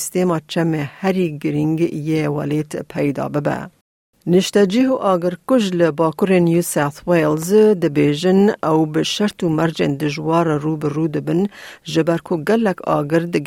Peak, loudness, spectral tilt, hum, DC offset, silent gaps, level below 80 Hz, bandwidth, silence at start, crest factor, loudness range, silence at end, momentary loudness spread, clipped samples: -4 dBFS; -18 LUFS; -6 dB/octave; none; under 0.1%; 3.81-4.13 s; -56 dBFS; 16.5 kHz; 0 s; 14 dB; 4 LU; 0 s; 7 LU; under 0.1%